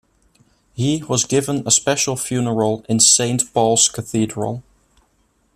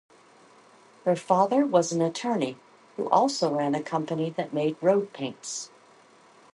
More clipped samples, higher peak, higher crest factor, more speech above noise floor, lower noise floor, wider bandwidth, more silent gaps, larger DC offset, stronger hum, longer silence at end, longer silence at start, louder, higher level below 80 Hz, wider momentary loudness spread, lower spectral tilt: neither; first, 0 dBFS vs -6 dBFS; about the same, 18 dB vs 22 dB; first, 44 dB vs 30 dB; first, -62 dBFS vs -56 dBFS; first, 14.5 kHz vs 11.5 kHz; neither; neither; neither; about the same, 0.95 s vs 0.9 s; second, 0.75 s vs 1.05 s; first, -17 LUFS vs -26 LUFS; first, -54 dBFS vs -76 dBFS; about the same, 11 LU vs 12 LU; second, -3 dB/octave vs -5 dB/octave